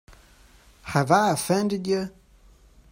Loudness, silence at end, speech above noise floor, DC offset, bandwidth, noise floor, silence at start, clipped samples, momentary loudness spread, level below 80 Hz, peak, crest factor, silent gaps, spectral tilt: -23 LUFS; 0.8 s; 32 dB; under 0.1%; 16 kHz; -54 dBFS; 0.1 s; under 0.1%; 12 LU; -56 dBFS; -4 dBFS; 22 dB; none; -5 dB/octave